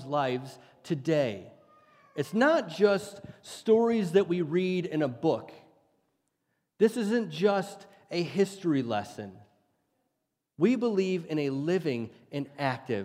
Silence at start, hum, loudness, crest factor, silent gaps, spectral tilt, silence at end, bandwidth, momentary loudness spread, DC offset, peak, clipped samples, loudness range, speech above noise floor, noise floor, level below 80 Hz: 0 s; none; -29 LUFS; 20 dB; none; -6.5 dB/octave; 0 s; 15.5 kHz; 14 LU; under 0.1%; -10 dBFS; under 0.1%; 4 LU; 54 dB; -82 dBFS; -76 dBFS